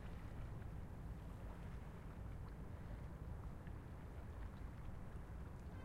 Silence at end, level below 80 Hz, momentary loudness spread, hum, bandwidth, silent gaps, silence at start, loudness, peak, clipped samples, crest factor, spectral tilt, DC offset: 0 s; -54 dBFS; 2 LU; none; 16 kHz; none; 0 s; -54 LUFS; -38 dBFS; under 0.1%; 12 dB; -7.5 dB/octave; under 0.1%